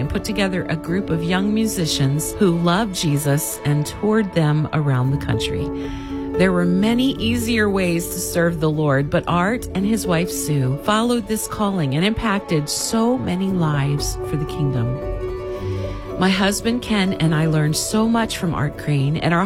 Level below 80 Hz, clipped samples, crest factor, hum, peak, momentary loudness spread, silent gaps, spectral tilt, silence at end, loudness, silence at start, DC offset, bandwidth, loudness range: -38 dBFS; under 0.1%; 16 dB; none; -4 dBFS; 6 LU; none; -5.5 dB/octave; 0 s; -20 LUFS; 0 s; under 0.1%; 16.5 kHz; 2 LU